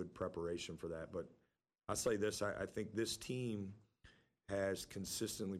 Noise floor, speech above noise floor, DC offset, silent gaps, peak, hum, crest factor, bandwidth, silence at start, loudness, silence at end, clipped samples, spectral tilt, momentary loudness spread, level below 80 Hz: -69 dBFS; 26 dB; under 0.1%; none; -26 dBFS; none; 18 dB; 15.5 kHz; 0 s; -43 LUFS; 0 s; under 0.1%; -4 dB/octave; 10 LU; -68 dBFS